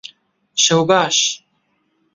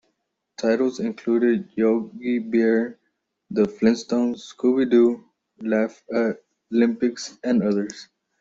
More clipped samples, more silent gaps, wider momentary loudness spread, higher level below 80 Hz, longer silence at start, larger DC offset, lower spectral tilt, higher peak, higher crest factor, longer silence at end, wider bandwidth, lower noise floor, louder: neither; neither; about the same, 11 LU vs 10 LU; about the same, -62 dBFS vs -66 dBFS; second, 0.05 s vs 0.6 s; neither; second, -2.5 dB/octave vs -6 dB/octave; first, 0 dBFS vs -6 dBFS; about the same, 18 dB vs 16 dB; first, 0.8 s vs 0.35 s; about the same, 8 kHz vs 7.8 kHz; second, -65 dBFS vs -75 dBFS; first, -15 LUFS vs -22 LUFS